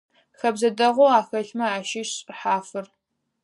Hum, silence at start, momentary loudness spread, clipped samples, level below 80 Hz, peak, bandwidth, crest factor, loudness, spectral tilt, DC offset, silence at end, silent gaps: none; 0.45 s; 12 LU; under 0.1%; -80 dBFS; -4 dBFS; 11.5 kHz; 20 dB; -22 LUFS; -3 dB/octave; under 0.1%; 0.6 s; none